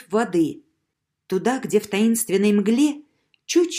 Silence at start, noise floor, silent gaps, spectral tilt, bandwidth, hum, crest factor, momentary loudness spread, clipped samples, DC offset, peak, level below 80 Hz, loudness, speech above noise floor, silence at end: 0.1 s; -78 dBFS; none; -4.5 dB/octave; 15.5 kHz; none; 14 dB; 6 LU; under 0.1%; under 0.1%; -6 dBFS; -68 dBFS; -21 LUFS; 58 dB; 0 s